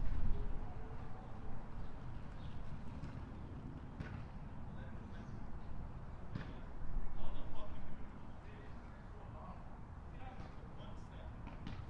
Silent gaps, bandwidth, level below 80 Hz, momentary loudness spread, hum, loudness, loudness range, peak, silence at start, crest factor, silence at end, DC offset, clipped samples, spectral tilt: none; 4.9 kHz; -46 dBFS; 5 LU; none; -51 LUFS; 3 LU; -22 dBFS; 0 s; 18 dB; 0 s; under 0.1%; under 0.1%; -8 dB/octave